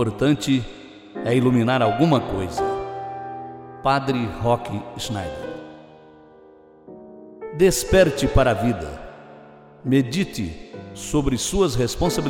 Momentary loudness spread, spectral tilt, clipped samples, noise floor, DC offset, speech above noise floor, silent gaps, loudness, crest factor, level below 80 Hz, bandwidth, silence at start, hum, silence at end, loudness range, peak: 20 LU; -5.5 dB/octave; under 0.1%; -49 dBFS; under 0.1%; 28 dB; none; -21 LUFS; 18 dB; -36 dBFS; 16.5 kHz; 0 s; none; 0 s; 6 LU; -4 dBFS